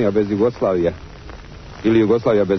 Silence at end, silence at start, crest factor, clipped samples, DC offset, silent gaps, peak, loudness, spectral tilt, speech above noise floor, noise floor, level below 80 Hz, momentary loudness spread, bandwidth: 0 s; 0 s; 12 dB; under 0.1%; under 0.1%; none; -6 dBFS; -18 LUFS; -8 dB/octave; 19 dB; -36 dBFS; -42 dBFS; 22 LU; 6.4 kHz